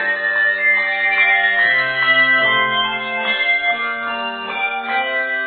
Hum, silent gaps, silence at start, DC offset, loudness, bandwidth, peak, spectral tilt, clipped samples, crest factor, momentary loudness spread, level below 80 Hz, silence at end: none; none; 0 s; under 0.1%; -15 LUFS; 4.7 kHz; -4 dBFS; -5.5 dB/octave; under 0.1%; 14 dB; 8 LU; -66 dBFS; 0 s